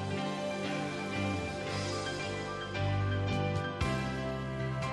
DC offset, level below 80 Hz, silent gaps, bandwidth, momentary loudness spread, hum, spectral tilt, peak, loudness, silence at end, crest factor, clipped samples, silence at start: under 0.1%; -52 dBFS; none; 11.5 kHz; 4 LU; none; -5.5 dB/octave; -20 dBFS; -35 LUFS; 0 s; 14 dB; under 0.1%; 0 s